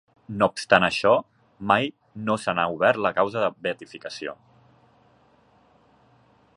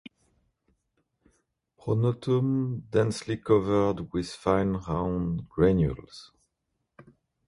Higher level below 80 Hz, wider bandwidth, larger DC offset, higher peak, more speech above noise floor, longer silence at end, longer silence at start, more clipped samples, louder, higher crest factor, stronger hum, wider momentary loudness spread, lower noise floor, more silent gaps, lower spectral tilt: second, -60 dBFS vs -48 dBFS; about the same, 11.5 kHz vs 11.5 kHz; neither; first, -2 dBFS vs -8 dBFS; second, 36 dB vs 54 dB; first, 2.25 s vs 1.25 s; second, 0.3 s vs 1.85 s; neither; first, -23 LUFS vs -27 LUFS; about the same, 24 dB vs 20 dB; neither; first, 16 LU vs 10 LU; second, -59 dBFS vs -80 dBFS; neither; second, -5 dB/octave vs -7.5 dB/octave